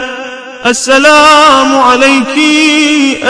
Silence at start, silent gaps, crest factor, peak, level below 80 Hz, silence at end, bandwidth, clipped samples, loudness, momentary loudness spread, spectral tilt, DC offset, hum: 0 s; none; 6 dB; 0 dBFS; -42 dBFS; 0 s; 11 kHz; 6%; -5 LUFS; 12 LU; -1.5 dB/octave; under 0.1%; none